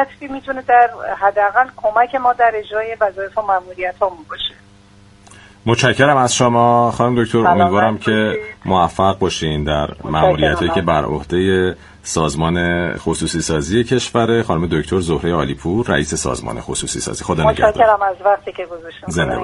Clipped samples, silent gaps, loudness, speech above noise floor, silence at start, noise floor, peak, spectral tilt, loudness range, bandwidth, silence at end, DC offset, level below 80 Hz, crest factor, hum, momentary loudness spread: under 0.1%; none; -16 LUFS; 30 dB; 0 s; -46 dBFS; 0 dBFS; -5 dB/octave; 4 LU; 11.5 kHz; 0 s; under 0.1%; -36 dBFS; 16 dB; none; 10 LU